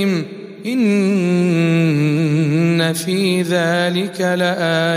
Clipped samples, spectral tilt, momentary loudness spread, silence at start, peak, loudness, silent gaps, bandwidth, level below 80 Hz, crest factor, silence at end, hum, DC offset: under 0.1%; -6 dB/octave; 4 LU; 0 s; -4 dBFS; -16 LUFS; none; 15.5 kHz; -62 dBFS; 12 dB; 0 s; none; under 0.1%